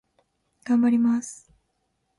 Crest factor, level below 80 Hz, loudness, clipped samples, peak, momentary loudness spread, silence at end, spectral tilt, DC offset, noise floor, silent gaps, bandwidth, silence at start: 12 dB; -68 dBFS; -22 LUFS; under 0.1%; -14 dBFS; 20 LU; 0.85 s; -5.5 dB/octave; under 0.1%; -74 dBFS; none; 11.5 kHz; 0.65 s